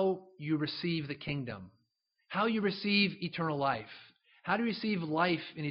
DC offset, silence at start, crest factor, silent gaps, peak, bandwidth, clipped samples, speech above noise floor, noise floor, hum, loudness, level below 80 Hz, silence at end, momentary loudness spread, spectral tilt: under 0.1%; 0 s; 18 dB; none; -14 dBFS; 5.8 kHz; under 0.1%; 46 dB; -80 dBFS; none; -33 LUFS; -70 dBFS; 0 s; 11 LU; -4 dB/octave